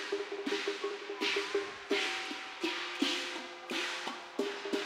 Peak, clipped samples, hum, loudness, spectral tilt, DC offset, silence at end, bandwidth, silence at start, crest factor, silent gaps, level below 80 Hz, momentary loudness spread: -18 dBFS; under 0.1%; none; -35 LUFS; -1 dB/octave; under 0.1%; 0 s; 16 kHz; 0 s; 18 dB; none; -80 dBFS; 7 LU